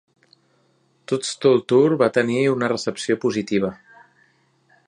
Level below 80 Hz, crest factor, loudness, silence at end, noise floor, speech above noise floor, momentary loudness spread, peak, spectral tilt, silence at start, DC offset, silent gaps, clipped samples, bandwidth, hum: -64 dBFS; 18 dB; -20 LUFS; 1.15 s; -63 dBFS; 43 dB; 9 LU; -2 dBFS; -5.5 dB/octave; 1.1 s; under 0.1%; none; under 0.1%; 11 kHz; none